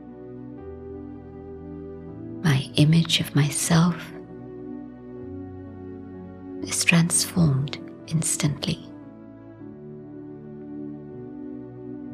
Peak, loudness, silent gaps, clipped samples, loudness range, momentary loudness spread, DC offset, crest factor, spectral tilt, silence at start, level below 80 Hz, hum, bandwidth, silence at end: -4 dBFS; -22 LUFS; none; under 0.1%; 8 LU; 21 LU; under 0.1%; 22 dB; -4.5 dB/octave; 0 s; -54 dBFS; none; 15.5 kHz; 0 s